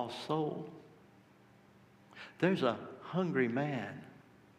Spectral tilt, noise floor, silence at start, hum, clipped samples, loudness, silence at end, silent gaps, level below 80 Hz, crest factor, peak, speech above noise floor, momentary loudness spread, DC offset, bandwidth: -7 dB/octave; -63 dBFS; 0 s; none; under 0.1%; -35 LUFS; 0.4 s; none; -80 dBFS; 22 dB; -16 dBFS; 28 dB; 20 LU; under 0.1%; 12.5 kHz